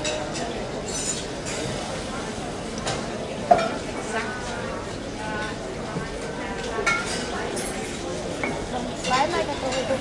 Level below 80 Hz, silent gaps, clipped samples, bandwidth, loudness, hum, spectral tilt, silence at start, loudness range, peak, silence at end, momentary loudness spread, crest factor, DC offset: -44 dBFS; none; under 0.1%; 11.5 kHz; -27 LUFS; none; -3.5 dB/octave; 0 s; 3 LU; -2 dBFS; 0 s; 9 LU; 26 dB; under 0.1%